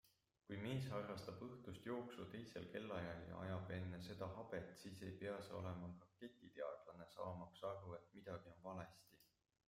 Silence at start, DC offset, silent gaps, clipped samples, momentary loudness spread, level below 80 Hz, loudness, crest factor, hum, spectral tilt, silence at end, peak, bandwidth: 0.05 s; under 0.1%; none; under 0.1%; 9 LU; -78 dBFS; -52 LUFS; 18 dB; none; -6.5 dB/octave; 0.45 s; -34 dBFS; 15.5 kHz